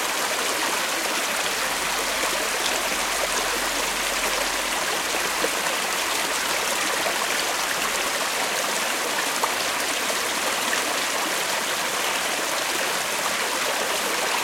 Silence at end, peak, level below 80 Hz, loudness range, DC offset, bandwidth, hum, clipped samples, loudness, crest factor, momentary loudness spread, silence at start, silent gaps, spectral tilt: 0 s; -4 dBFS; -54 dBFS; 0 LU; under 0.1%; 16.5 kHz; none; under 0.1%; -23 LUFS; 20 dB; 1 LU; 0 s; none; 0 dB/octave